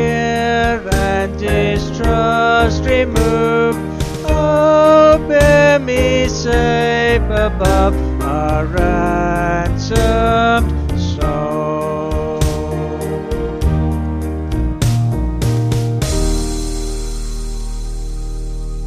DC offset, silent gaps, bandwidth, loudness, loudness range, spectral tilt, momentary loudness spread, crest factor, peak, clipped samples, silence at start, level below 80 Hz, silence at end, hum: under 0.1%; none; 14 kHz; -15 LUFS; 7 LU; -6 dB/octave; 12 LU; 14 dB; 0 dBFS; under 0.1%; 0 s; -22 dBFS; 0 s; none